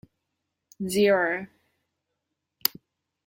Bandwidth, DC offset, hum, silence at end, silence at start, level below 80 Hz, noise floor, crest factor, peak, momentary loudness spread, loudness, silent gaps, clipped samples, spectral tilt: 16.5 kHz; under 0.1%; none; 0.55 s; 0.8 s; -68 dBFS; -82 dBFS; 30 dB; 0 dBFS; 14 LU; -25 LUFS; none; under 0.1%; -4 dB/octave